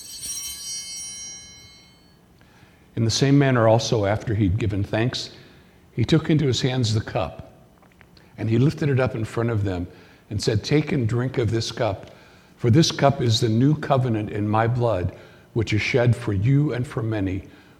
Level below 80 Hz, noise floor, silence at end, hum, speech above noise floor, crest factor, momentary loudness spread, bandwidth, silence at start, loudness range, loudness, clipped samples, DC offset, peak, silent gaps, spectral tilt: -48 dBFS; -53 dBFS; 0.3 s; none; 33 dB; 20 dB; 13 LU; 13.5 kHz; 0 s; 4 LU; -22 LUFS; under 0.1%; under 0.1%; -2 dBFS; none; -6 dB/octave